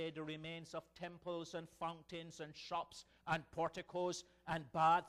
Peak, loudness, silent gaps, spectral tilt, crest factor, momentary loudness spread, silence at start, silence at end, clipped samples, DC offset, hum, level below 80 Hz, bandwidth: -22 dBFS; -44 LUFS; none; -4.5 dB/octave; 20 dB; 10 LU; 0 s; 0 s; under 0.1%; under 0.1%; none; -72 dBFS; 13.5 kHz